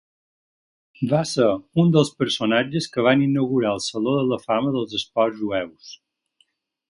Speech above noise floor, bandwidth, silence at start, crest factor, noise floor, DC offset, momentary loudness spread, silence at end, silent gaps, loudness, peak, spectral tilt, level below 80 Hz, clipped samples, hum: 45 dB; 11.5 kHz; 1 s; 18 dB; -66 dBFS; under 0.1%; 8 LU; 0.95 s; none; -21 LUFS; -4 dBFS; -6 dB/octave; -60 dBFS; under 0.1%; none